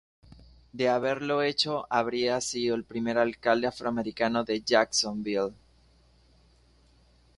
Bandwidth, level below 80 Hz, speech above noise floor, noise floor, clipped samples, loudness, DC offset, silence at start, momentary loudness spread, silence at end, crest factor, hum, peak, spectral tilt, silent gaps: 11.5 kHz; -62 dBFS; 34 dB; -61 dBFS; under 0.1%; -28 LUFS; under 0.1%; 0.75 s; 6 LU; 1.85 s; 22 dB; 60 Hz at -55 dBFS; -8 dBFS; -3.5 dB/octave; none